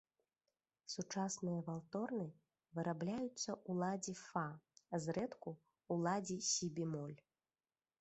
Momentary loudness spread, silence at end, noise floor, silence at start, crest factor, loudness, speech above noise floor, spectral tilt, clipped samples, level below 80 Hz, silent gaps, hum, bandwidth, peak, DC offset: 12 LU; 0.85 s; under -90 dBFS; 0.9 s; 18 dB; -43 LUFS; over 47 dB; -4.5 dB/octave; under 0.1%; -80 dBFS; none; none; 8.2 kHz; -26 dBFS; under 0.1%